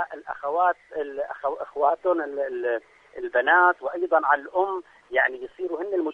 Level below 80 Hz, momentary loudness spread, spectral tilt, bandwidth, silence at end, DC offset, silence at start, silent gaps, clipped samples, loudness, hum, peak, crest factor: -70 dBFS; 12 LU; -5 dB/octave; 5.8 kHz; 0 s; under 0.1%; 0 s; none; under 0.1%; -24 LUFS; none; -6 dBFS; 18 dB